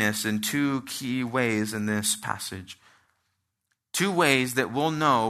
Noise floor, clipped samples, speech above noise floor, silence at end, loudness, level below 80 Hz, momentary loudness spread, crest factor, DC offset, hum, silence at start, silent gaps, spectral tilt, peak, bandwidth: -78 dBFS; under 0.1%; 53 dB; 0 s; -26 LUFS; -68 dBFS; 11 LU; 22 dB; under 0.1%; none; 0 s; none; -3.5 dB/octave; -6 dBFS; 14 kHz